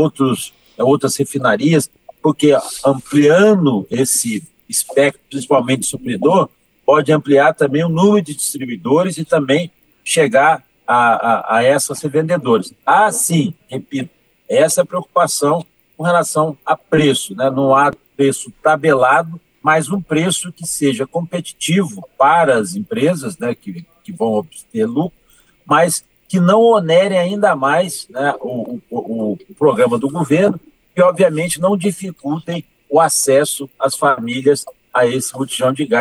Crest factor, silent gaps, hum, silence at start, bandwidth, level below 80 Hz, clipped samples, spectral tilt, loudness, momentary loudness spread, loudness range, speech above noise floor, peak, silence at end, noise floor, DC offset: 14 dB; none; none; 0 s; 14 kHz; -60 dBFS; under 0.1%; -4.5 dB/octave; -15 LUFS; 11 LU; 3 LU; 34 dB; -2 dBFS; 0 s; -49 dBFS; under 0.1%